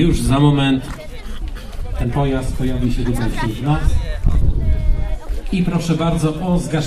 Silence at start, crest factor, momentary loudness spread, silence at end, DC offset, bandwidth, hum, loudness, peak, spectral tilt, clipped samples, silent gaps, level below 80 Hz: 0 s; 16 dB; 16 LU; 0 s; under 0.1%; 13 kHz; none; -19 LUFS; 0 dBFS; -6.5 dB/octave; under 0.1%; none; -20 dBFS